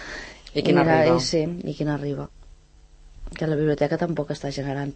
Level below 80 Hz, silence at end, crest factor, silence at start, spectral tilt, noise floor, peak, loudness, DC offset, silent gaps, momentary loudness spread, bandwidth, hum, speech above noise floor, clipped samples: -46 dBFS; 0 s; 18 dB; 0 s; -6 dB/octave; -51 dBFS; -6 dBFS; -23 LUFS; under 0.1%; none; 16 LU; 8.8 kHz; none; 28 dB; under 0.1%